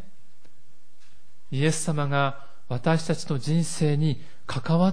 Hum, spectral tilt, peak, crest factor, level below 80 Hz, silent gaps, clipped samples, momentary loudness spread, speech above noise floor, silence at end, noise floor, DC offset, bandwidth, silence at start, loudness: none; -6 dB/octave; -10 dBFS; 16 dB; -60 dBFS; none; under 0.1%; 10 LU; 39 dB; 0 s; -63 dBFS; 3%; 10.5 kHz; 1.5 s; -26 LUFS